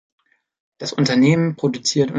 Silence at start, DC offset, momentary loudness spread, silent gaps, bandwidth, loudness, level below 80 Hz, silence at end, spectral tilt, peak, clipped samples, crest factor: 0.8 s; under 0.1%; 11 LU; none; 9.4 kHz; -18 LUFS; -60 dBFS; 0 s; -5.5 dB/octave; -4 dBFS; under 0.1%; 16 dB